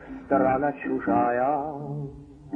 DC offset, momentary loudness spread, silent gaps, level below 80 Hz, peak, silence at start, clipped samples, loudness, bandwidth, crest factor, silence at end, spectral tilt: under 0.1%; 12 LU; none; -54 dBFS; -10 dBFS; 0 s; under 0.1%; -25 LUFS; 3.6 kHz; 16 dB; 0 s; -10.5 dB/octave